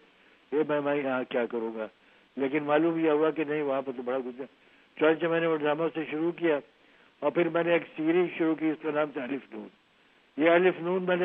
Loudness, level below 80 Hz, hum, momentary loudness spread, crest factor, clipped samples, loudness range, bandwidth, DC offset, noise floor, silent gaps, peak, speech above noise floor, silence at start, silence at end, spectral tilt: -28 LUFS; -82 dBFS; none; 12 LU; 20 dB; under 0.1%; 1 LU; 4 kHz; under 0.1%; -63 dBFS; none; -10 dBFS; 36 dB; 0.5 s; 0 s; -9 dB/octave